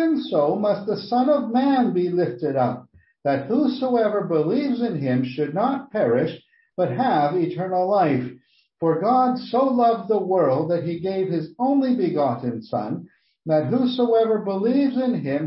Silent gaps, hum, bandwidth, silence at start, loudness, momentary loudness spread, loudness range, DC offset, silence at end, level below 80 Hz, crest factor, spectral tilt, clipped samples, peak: none; none; 5.8 kHz; 0 s; -22 LUFS; 7 LU; 2 LU; under 0.1%; 0 s; -68 dBFS; 12 dB; -11.5 dB/octave; under 0.1%; -8 dBFS